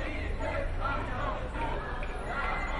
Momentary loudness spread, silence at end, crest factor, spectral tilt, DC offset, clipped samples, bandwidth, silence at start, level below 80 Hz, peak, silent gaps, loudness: 3 LU; 0 s; 14 dB; -6 dB/octave; under 0.1%; under 0.1%; 11 kHz; 0 s; -36 dBFS; -20 dBFS; none; -34 LUFS